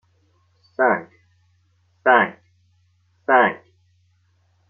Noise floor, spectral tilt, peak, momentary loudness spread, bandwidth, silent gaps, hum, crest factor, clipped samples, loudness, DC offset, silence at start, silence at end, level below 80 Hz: -62 dBFS; -2.5 dB/octave; -2 dBFS; 18 LU; 4.8 kHz; none; none; 22 dB; under 0.1%; -19 LUFS; under 0.1%; 0.8 s; 1.15 s; -76 dBFS